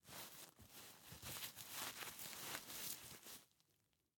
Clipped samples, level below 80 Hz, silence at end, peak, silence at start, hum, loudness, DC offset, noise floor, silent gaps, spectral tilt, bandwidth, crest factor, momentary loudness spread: under 0.1%; -78 dBFS; 0.7 s; -28 dBFS; 0.05 s; none; -51 LUFS; under 0.1%; -83 dBFS; none; -1 dB/octave; 17.5 kHz; 26 dB; 11 LU